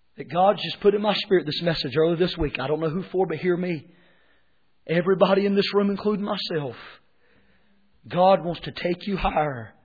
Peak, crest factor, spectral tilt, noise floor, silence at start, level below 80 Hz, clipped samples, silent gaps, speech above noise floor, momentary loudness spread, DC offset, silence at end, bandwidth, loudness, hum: -6 dBFS; 18 dB; -8 dB/octave; -69 dBFS; 0.2 s; -46 dBFS; under 0.1%; none; 46 dB; 10 LU; under 0.1%; 0.15 s; 5 kHz; -23 LUFS; none